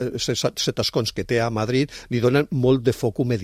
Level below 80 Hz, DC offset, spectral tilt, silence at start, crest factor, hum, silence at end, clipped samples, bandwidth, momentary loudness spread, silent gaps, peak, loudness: -48 dBFS; under 0.1%; -5.5 dB/octave; 0 s; 16 dB; none; 0 s; under 0.1%; 15.5 kHz; 4 LU; none; -6 dBFS; -22 LUFS